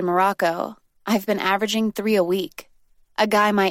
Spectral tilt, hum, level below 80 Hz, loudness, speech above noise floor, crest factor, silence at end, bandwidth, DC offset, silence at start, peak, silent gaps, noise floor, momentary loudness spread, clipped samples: -4.5 dB/octave; none; -64 dBFS; -21 LUFS; 36 dB; 16 dB; 0 s; 16.5 kHz; under 0.1%; 0 s; -6 dBFS; none; -56 dBFS; 15 LU; under 0.1%